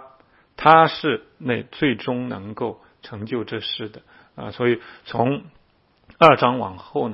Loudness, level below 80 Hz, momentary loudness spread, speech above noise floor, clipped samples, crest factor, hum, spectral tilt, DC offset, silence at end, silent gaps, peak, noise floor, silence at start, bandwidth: -20 LUFS; -58 dBFS; 17 LU; 39 dB; under 0.1%; 22 dB; none; -7.5 dB/octave; under 0.1%; 0 s; none; 0 dBFS; -60 dBFS; 0.6 s; 8 kHz